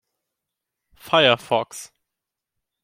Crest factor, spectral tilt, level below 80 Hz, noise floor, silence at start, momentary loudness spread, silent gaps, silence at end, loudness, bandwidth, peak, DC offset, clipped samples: 22 dB; -3.5 dB/octave; -68 dBFS; -85 dBFS; 1.05 s; 18 LU; none; 1 s; -19 LUFS; 16 kHz; -2 dBFS; under 0.1%; under 0.1%